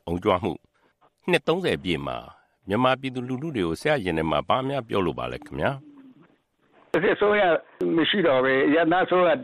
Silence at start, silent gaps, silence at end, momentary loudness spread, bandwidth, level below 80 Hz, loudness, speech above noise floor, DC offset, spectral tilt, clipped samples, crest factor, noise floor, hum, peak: 0.05 s; none; 0 s; 11 LU; 13 kHz; -54 dBFS; -24 LUFS; 40 dB; under 0.1%; -6 dB/octave; under 0.1%; 18 dB; -64 dBFS; none; -6 dBFS